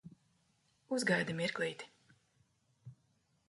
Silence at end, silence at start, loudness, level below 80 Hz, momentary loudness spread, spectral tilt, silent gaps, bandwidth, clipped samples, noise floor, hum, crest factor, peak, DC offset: 0.55 s; 0.05 s; -36 LUFS; -78 dBFS; 16 LU; -4.5 dB/octave; none; 11.5 kHz; under 0.1%; -76 dBFS; none; 22 dB; -20 dBFS; under 0.1%